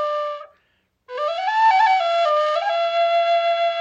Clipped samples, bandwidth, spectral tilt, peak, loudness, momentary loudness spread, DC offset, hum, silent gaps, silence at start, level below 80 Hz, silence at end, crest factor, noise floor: under 0.1%; 8 kHz; 1 dB/octave; -6 dBFS; -19 LUFS; 11 LU; under 0.1%; none; none; 0 s; -76 dBFS; 0 s; 14 dB; -67 dBFS